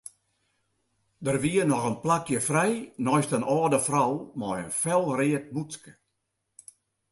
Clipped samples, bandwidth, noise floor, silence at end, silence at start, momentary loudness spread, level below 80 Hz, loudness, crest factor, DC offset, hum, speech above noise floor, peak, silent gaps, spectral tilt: under 0.1%; 12 kHz; -79 dBFS; 1.2 s; 1.2 s; 11 LU; -64 dBFS; -26 LUFS; 18 dB; under 0.1%; none; 53 dB; -10 dBFS; none; -5 dB/octave